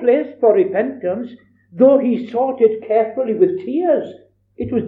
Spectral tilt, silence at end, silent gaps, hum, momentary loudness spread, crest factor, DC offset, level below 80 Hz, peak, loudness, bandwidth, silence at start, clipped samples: -10 dB/octave; 0 s; none; none; 11 LU; 16 dB; under 0.1%; -56 dBFS; -2 dBFS; -17 LUFS; 4.2 kHz; 0 s; under 0.1%